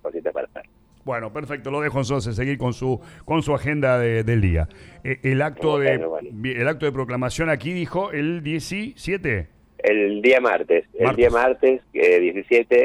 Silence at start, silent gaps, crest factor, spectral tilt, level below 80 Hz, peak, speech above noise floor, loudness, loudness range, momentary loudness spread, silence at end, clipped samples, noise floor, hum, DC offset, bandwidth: 0.05 s; none; 14 dB; -6.5 dB/octave; -40 dBFS; -6 dBFS; 22 dB; -22 LUFS; 6 LU; 12 LU; 0 s; under 0.1%; -43 dBFS; none; under 0.1%; 12.5 kHz